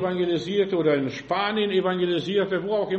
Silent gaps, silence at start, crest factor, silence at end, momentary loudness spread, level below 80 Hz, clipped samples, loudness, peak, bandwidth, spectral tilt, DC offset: none; 0 s; 14 dB; 0 s; 3 LU; -62 dBFS; under 0.1%; -24 LUFS; -10 dBFS; 8 kHz; -6.5 dB/octave; under 0.1%